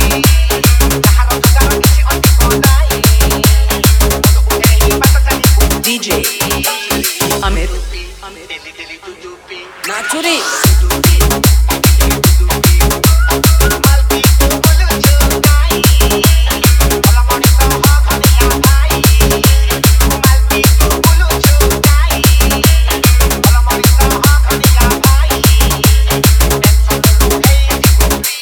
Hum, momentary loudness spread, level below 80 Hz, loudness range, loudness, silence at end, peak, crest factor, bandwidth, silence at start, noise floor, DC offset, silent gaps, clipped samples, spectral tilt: none; 4 LU; -12 dBFS; 5 LU; -10 LUFS; 0 s; 0 dBFS; 8 dB; over 20 kHz; 0 s; -30 dBFS; under 0.1%; none; under 0.1%; -4 dB/octave